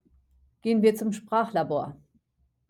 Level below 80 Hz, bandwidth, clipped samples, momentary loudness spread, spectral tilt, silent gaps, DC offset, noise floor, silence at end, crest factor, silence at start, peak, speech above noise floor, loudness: -66 dBFS; 16 kHz; under 0.1%; 10 LU; -6.5 dB/octave; none; under 0.1%; -72 dBFS; 0.75 s; 18 dB; 0.65 s; -10 dBFS; 47 dB; -26 LUFS